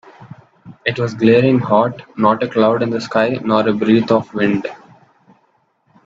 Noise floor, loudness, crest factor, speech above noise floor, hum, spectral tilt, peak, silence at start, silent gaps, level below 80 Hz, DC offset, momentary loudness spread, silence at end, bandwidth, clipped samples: -60 dBFS; -16 LUFS; 16 dB; 46 dB; none; -7.5 dB/octave; 0 dBFS; 0.2 s; none; -58 dBFS; under 0.1%; 8 LU; 1.3 s; 7.6 kHz; under 0.1%